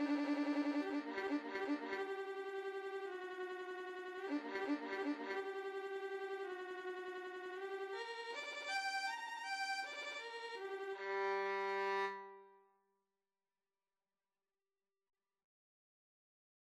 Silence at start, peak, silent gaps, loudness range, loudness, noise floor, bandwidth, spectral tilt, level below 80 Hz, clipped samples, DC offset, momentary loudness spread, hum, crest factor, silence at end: 0 s; -28 dBFS; none; 4 LU; -43 LUFS; under -90 dBFS; 13 kHz; -2.5 dB/octave; under -90 dBFS; under 0.1%; under 0.1%; 8 LU; none; 16 dB; 4.05 s